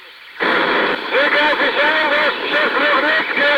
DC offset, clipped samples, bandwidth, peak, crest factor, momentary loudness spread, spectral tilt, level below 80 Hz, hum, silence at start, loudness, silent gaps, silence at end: under 0.1%; under 0.1%; 16.5 kHz; -4 dBFS; 12 dB; 3 LU; -3.5 dB/octave; -56 dBFS; none; 0 s; -15 LUFS; none; 0 s